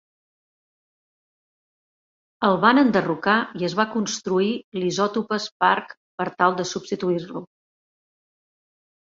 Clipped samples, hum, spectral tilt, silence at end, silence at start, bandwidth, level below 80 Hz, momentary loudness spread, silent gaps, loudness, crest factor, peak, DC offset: under 0.1%; none; -4.5 dB/octave; 1.75 s; 2.4 s; 7.8 kHz; -66 dBFS; 10 LU; 4.64-4.72 s, 5.52-5.60 s, 5.97-6.18 s; -22 LUFS; 22 dB; -2 dBFS; under 0.1%